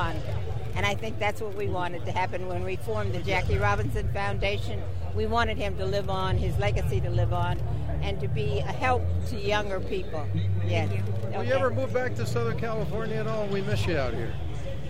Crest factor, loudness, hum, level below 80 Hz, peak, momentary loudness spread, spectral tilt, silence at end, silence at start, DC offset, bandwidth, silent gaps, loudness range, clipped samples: 16 dB; -29 LUFS; none; -38 dBFS; -10 dBFS; 6 LU; -6.5 dB/octave; 0 s; 0 s; 3%; 15.5 kHz; none; 1 LU; under 0.1%